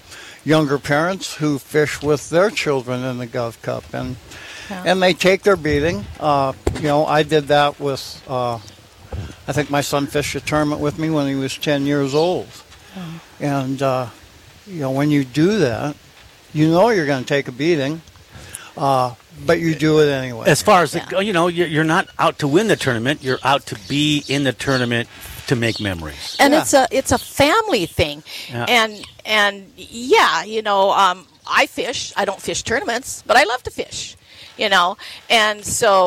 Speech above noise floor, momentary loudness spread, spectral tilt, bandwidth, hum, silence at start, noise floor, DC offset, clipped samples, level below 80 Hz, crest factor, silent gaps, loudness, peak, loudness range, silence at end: 27 dB; 15 LU; -4.5 dB/octave; 17 kHz; none; 0.1 s; -45 dBFS; under 0.1%; under 0.1%; -44 dBFS; 16 dB; none; -18 LUFS; -2 dBFS; 4 LU; 0 s